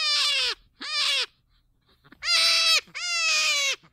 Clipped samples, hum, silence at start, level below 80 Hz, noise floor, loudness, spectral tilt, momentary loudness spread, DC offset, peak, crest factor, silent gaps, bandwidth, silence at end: under 0.1%; none; 0 s; -66 dBFS; -66 dBFS; -22 LUFS; 3.5 dB/octave; 11 LU; under 0.1%; -8 dBFS; 18 dB; none; 16 kHz; 0.15 s